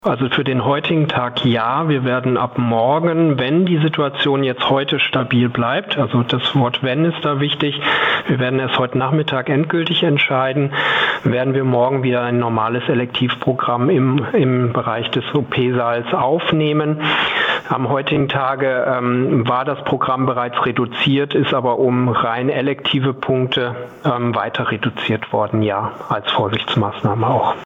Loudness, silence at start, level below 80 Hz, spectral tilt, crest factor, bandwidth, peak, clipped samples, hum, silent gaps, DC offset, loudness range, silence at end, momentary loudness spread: -17 LUFS; 0.05 s; -56 dBFS; -8 dB/octave; 12 dB; 7.2 kHz; -6 dBFS; under 0.1%; none; none; under 0.1%; 2 LU; 0 s; 4 LU